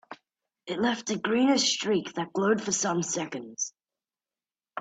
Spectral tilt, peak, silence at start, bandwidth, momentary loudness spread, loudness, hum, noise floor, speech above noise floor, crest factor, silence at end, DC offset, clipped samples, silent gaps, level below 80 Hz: -3 dB/octave; -12 dBFS; 0.1 s; 9.2 kHz; 12 LU; -27 LUFS; none; under -90 dBFS; over 63 dB; 18 dB; 0 s; under 0.1%; under 0.1%; none; -72 dBFS